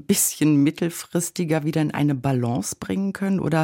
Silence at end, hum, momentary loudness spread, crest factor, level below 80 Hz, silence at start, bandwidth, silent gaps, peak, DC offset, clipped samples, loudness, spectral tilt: 0 s; none; 7 LU; 14 dB; -58 dBFS; 0.1 s; 17 kHz; none; -8 dBFS; under 0.1%; under 0.1%; -22 LUFS; -5 dB/octave